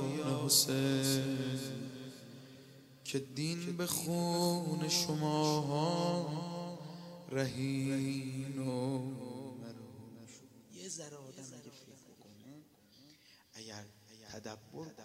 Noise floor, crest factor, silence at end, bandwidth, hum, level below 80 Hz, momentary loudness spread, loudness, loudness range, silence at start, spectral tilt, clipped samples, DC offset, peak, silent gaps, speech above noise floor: -63 dBFS; 24 dB; 0 s; 16 kHz; none; -74 dBFS; 22 LU; -35 LUFS; 17 LU; 0 s; -4.5 dB/octave; under 0.1%; under 0.1%; -14 dBFS; none; 28 dB